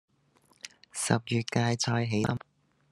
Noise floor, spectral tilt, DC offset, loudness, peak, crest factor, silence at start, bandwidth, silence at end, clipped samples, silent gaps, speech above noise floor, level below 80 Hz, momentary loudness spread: -66 dBFS; -4.5 dB/octave; under 0.1%; -29 LUFS; -8 dBFS; 24 dB; 0.65 s; 12.5 kHz; 0.55 s; under 0.1%; none; 38 dB; -64 dBFS; 19 LU